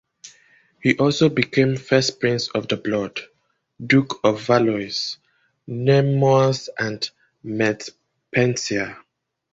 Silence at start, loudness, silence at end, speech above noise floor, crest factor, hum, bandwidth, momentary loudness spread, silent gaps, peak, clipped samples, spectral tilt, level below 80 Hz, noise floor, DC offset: 0.25 s; -20 LUFS; 0.55 s; 44 dB; 20 dB; none; 7.8 kHz; 14 LU; none; -2 dBFS; under 0.1%; -5.5 dB/octave; -56 dBFS; -64 dBFS; under 0.1%